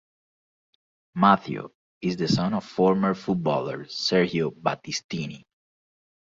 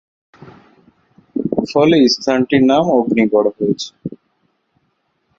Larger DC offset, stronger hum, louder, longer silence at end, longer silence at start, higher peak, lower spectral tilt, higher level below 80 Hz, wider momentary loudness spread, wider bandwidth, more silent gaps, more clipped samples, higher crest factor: neither; neither; second, -25 LUFS vs -15 LUFS; second, 0.85 s vs 1.25 s; first, 1.15 s vs 0.45 s; about the same, -2 dBFS vs -2 dBFS; about the same, -5.5 dB/octave vs -5.5 dB/octave; second, -62 dBFS vs -56 dBFS; about the same, 14 LU vs 15 LU; about the same, 7.6 kHz vs 7.6 kHz; first, 1.75-2.01 s, 5.04-5.09 s vs none; neither; first, 24 dB vs 16 dB